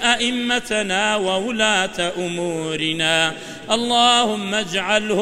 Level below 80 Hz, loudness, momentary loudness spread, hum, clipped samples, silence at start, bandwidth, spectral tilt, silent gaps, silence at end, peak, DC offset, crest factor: -52 dBFS; -19 LUFS; 8 LU; none; under 0.1%; 0 s; 16 kHz; -2.5 dB/octave; none; 0 s; -2 dBFS; 0.3%; 18 dB